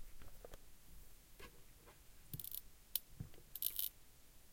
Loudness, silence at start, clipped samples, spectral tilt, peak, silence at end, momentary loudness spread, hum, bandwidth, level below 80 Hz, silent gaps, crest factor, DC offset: -45 LUFS; 0 s; under 0.1%; -2 dB/octave; -18 dBFS; 0 s; 22 LU; none; 17 kHz; -62 dBFS; none; 34 dB; under 0.1%